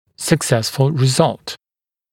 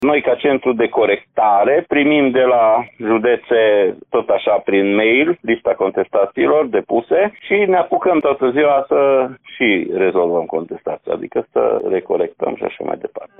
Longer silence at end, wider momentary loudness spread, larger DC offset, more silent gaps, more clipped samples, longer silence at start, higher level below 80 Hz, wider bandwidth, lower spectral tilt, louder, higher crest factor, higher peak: first, 0.6 s vs 0.15 s; first, 15 LU vs 9 LU; neither; neither; neither; first, 0.2 s vs 0 s; first, -52 dBFS vs -58 dBFS; first, 16.5 kHz vs 3.9 kHz; second, -5 dB/octave vs -8.5 dB/octave; about the same, -17 LUFS vs -16 LUFS; first, 18 dB vs 12 dB; about the same, 0 dBFS vs -2 dBFS